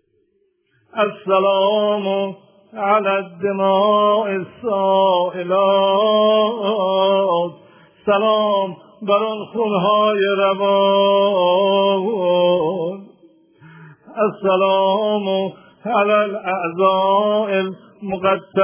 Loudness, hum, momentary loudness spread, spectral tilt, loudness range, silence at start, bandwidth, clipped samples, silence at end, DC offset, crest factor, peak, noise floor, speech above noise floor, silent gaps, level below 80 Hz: -17 LUFS; none; 10 LU; -9 dB/octave; 3 LU; 0.95 s; 3.5 kHz; under 0.1%; 0 s; under 0.1%; 16 dB; -2 dBFS; -64 dBFS; 47 dB; none; -66 dBFS